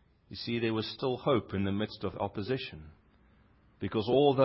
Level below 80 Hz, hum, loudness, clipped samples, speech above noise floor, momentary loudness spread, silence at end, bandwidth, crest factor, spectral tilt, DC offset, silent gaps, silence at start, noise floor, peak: -56 dBFS; none; -32 LUFS; under 0.1%; 33 dB; 13 LU; 0 s; 5.8 kHz; 20 dB; -10 dB/octave; under 0.1%; none; 0.3 s; -63 dBFS; -12 dBFS